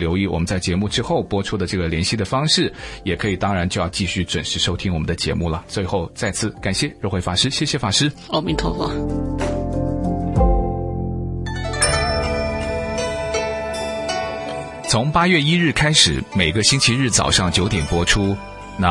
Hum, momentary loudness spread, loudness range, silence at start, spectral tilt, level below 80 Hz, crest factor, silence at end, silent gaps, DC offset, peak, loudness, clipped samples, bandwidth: none; 9 LU; 6 LU; 0 s; -4 dB/octave; -32 dBFS; 20 dB; 0 s; none; under 0.1%; 0 dBFS; -19 LUFS; under 0.1%; 11.5 kHz